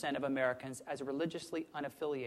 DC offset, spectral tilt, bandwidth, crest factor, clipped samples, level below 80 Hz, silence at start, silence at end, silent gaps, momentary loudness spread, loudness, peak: under 0.1%; -5 dB/octave; 14.5 kHz; 18 dB; under 0.1%; -76 dBFS; 0 s; 0 s; none; 9 LU; -39 LUFS; -20 dBFS